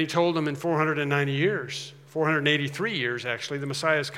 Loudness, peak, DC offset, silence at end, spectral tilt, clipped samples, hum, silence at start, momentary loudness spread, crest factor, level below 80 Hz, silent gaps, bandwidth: -26 LUFS; -6 dBFS; under 0.1%; 0 s; -5 dB/octave; under 0.1%; none; 0 s; 7 LU; 20 dB; -80 dBFS; none; 15.5 kHz